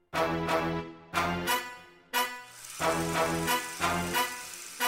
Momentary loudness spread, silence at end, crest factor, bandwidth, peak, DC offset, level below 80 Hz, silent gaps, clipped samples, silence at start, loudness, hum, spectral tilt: 11 LU; 0 s; 16 dB; 16 kHz; -14 dBFS; under 0.1%; -54 dBFS; none; under 0.1%; 0.15 s; -30 LUFS; none; -3 dB/octave